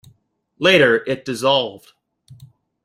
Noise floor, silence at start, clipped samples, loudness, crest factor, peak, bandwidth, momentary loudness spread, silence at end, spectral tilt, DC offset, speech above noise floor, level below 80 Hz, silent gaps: -60 dBFS; 0.6 s; under 0.1%; -17 LUFS; 18 dB; -2 dBFS; 15.5 kHz; 11 LU; 0.4 s; -4.5 dB/octave; under 0.1%; 43 dB; -62 dBFS; none